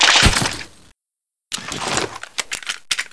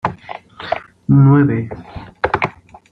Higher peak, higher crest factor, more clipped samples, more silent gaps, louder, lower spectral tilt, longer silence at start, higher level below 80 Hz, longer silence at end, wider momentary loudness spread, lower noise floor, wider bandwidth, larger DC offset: about the same, 0 dBFS vs -2 dBFS; about the same, 20 dB vs 16 dB; neither; neither; second, -19 LUFS vs -16 LUFS; second, -2 dB/octave vs -9.5 dB/octave; about the same, 0 s vs 0.05 s; first, -32 dBFS vs -46 dBFS; second, 0.1 s vs 0.4 s; second, 16 LU vs 22 LU; first, -84 dBFS vs -34 dBFS; first, 11 kHz vs 5.2 kHz; neither